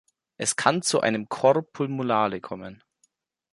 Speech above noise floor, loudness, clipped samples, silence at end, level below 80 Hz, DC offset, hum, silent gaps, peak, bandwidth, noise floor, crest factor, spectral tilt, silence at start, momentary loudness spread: 45 dB; -24 LUFS; under 0.1%; 0.8 s; -68 dBFS; under 0.1%; none; none; -4 dBFS; 11.5 kHz; -70 dBFS; 22 dB; -4 dB/octave; 0.4 s; 14 LU